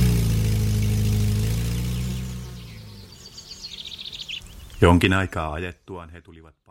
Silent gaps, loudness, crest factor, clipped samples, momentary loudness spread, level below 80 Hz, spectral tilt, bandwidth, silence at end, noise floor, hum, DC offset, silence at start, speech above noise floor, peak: none; -23 LUFS; 24 dB; under 0.1%; 22 LU; -32 dBFS; -6 dB/octave; 16.5 kHz; 0.3 s; -43 dBFS; none; under 0.1%; 0 s; 21 dB; 0 dBFS